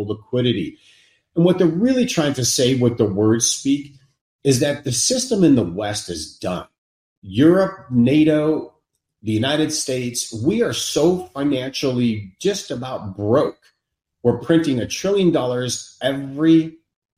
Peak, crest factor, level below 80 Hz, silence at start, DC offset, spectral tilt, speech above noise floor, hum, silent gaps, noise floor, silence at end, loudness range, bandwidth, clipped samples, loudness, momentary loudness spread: -2 dBFS; 18 dB; -54 dBFS; 0 s; under 0.1%; -5 dB/octave; 58 dB; none; 4.21-4.39 s, 6.78-7.22 s; -77 dBFS; 0.45 s; 3 LU; 16 kHz; under 0.1%; -19 LUFS; 10 LU